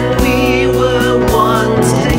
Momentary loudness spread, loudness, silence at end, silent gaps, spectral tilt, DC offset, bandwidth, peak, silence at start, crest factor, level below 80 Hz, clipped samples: 1 LU; -12 LUFS; 0 s; none; -5.5 dB/octave; 0.6%; 16.5 kHz; 0 dBFS; 0 s; 12 dB; -24 dBFS; under 0.1%